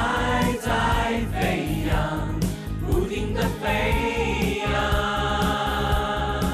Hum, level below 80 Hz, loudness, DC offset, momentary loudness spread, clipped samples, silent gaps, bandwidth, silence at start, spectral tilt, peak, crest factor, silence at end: none; -30 dBFS; -24 LUFS; under 0.1%; 4 LU; under 0.1%; none; 14 kHz; 0 s; -5.5 dB/octave; -12 dBFS; 10 dB; 0 s